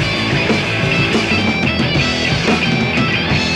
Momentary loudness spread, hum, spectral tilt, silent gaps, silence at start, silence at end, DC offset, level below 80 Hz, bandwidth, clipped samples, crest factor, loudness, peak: 1 LU; none; -5 dB/octave; none; 0 s; 0 s; under 0.1%; -34 dBFS; 13 kHz; under 0.1%; 14 dB; -14 LUFS; -2 dBFS